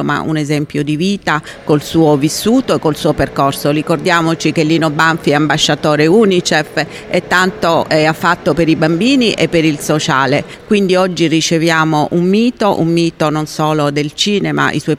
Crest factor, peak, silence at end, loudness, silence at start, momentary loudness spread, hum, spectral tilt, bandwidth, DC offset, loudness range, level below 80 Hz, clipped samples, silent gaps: 12 dB; 0 dBFS; 0 s; -13 LUFS; 0 s; 5 LU; none; -5 dB/octave; 15.5 kHz; under 0.1%; 2 LU; -42 dBFS; under 0.1%; none